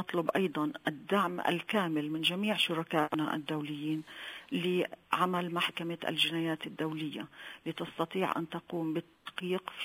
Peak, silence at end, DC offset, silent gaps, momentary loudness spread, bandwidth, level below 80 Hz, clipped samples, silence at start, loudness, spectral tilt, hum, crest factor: -12 dBFS; 0 s; under 0.1%; none; 10 LU; 16 kHz; -78 dBFS; under 0.1%; 0 s; -33 LUFS; -5 dB/octave; none; 22 dB